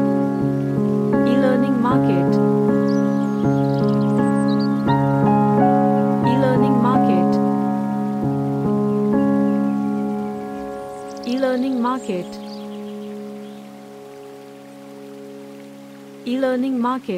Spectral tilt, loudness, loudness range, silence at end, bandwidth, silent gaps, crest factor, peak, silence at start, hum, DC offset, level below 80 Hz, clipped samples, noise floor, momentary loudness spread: -8.5 dB/octave; -19 LUFS; 15 LU; 0 s; 10 kHz; none; 14 dB; -4 dBFS; 0 s; none; under 0.1%; -52 dBFS; under 0.1%; -39 dBFS; 22 LU